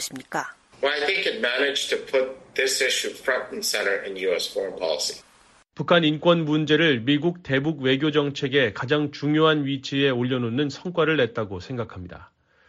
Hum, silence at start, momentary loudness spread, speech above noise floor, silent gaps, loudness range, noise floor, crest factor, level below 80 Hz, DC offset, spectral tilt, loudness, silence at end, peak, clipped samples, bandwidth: none; 0 s; 11 LU; 33 dB; none; 3 LU; -57 dBFS; 18 dB; -62 dBFS; under 0.1%; -4.5 dB/octave; -23 LUFS; 0.45 s; -6 dBFS; under 0.1%; 12.5 kHz